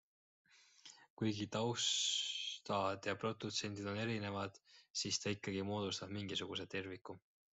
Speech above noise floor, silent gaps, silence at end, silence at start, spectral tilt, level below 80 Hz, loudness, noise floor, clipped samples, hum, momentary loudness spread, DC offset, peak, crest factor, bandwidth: 22 dB; 1.10-1.17 s, 4.90-4.94 s; 0.35 s; 0.85 s; -3 dB/octave; -80 dBFS; -40 LUFS; -63 dBFS; under 0.1%; none; 16 LU; under 0.1%; -24 dBFS; 18 dB; 8.2 kHz